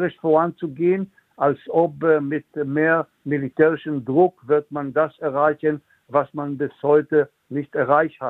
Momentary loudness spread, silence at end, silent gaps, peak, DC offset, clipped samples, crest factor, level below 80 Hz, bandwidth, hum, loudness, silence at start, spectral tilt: 8 LU; 0 s; none; -4 dBFS; under 0.1%; under 0.1%; 18 dB; -66 dBFS; 4 kHz; none; -21 LUFS; 0 s; -10 dB/octave